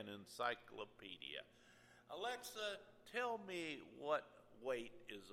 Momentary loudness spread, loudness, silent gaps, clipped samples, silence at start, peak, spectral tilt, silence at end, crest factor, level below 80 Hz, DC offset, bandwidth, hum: 13 LU; -48 LUFS; none; under 0.1%; 0 s; -26 dBFS; -3 dB/octave; 0 s; 22 dB; -82 dBFS; under 0.1%; 16 kHz; none